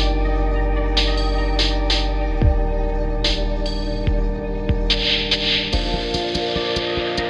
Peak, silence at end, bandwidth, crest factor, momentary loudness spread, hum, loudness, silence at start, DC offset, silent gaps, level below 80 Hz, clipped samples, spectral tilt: -4 dBFS; 0 s; 8.4 kHz; 16 dB; 7 LU; none; -21 LUFS; 0 s; under 0.1%; none; -22 dBFS; under 0.1%; -5 dB/octave